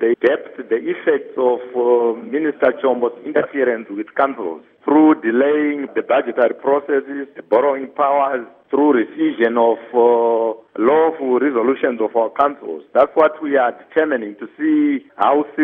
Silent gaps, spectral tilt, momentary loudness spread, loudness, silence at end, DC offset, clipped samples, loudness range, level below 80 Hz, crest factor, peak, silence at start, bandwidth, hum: none; -8 dB/octave; 8 LU; -17 LUFS; 0 s; under 0.1%; under 0.1%; 2 LU; -68 dBFS; 16 dB; -2 dBFS; 0 s; 3.8 kHz; none